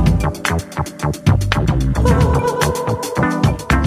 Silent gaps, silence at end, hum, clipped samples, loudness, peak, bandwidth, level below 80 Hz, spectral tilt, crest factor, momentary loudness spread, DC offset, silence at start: none; 0 s; none; under 0.1%; -17 LUFS; 0 dBFS; 16 kHz; -22 dBFS; -6 dB/octave; 16 dB; 7 LU; under 0.1%; 0 s